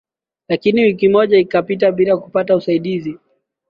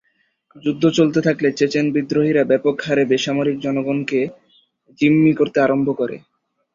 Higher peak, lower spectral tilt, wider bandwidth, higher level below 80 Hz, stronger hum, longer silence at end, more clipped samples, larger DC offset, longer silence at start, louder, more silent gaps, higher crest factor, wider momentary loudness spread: about the same, -2 dBFS vs -2 dBFS; first, -8.5 dB/octave vs -6.5 dB/octave; second, 5.4 kHz vs 7.4 kHz; about the same, -56 dBFS vs -60 dBFS; neither; about the same, 0.55 s vs 0.55 s; neither; neither; second, 0.5 s vs 0.65 s; first, -15 LUFS vs -18 LUFS; neither; about the same, 14 dB vs 16 dB; about the same, 10 LU vs 8 LU